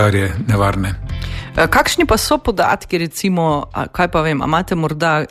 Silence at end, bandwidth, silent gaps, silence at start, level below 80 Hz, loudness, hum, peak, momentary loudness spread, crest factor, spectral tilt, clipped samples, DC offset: 0.05 s; 14 kHz; none; 0 s; -32 dBFS; -16 LUFS; none; -2 dBFS; 9 LU; 14 dB; -5 dB/octave; under 0.1%; under 0.1%